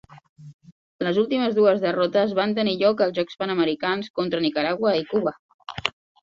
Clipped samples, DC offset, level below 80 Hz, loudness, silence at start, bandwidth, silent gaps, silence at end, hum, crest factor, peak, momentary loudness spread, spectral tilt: under 0.1%; under 0.1%; -62 dBFS; -23 LUFS; 0.1 s; 7.6 kHz; 0.29-0.36 s, 0.54-0.59 s, 0.72-0.99 s, 4.10-4.14 s, 5.39-5.59 s; 0.3 s; none; 22 dB; -2 dBFS; 9 LU; -6.5 dB/octave